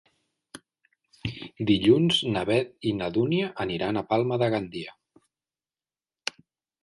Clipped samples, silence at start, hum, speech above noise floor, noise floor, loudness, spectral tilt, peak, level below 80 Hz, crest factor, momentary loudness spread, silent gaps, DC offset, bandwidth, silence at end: under 0.1%; 0.55 s; none; over 65 dB; under -90 dBFS; -26 LUFS; -6 dB/octave; -6 dBFS; -58 dBFS; 20 dB; 16 LU; none; under 0.1%; 11.5 kHz; 1.9 s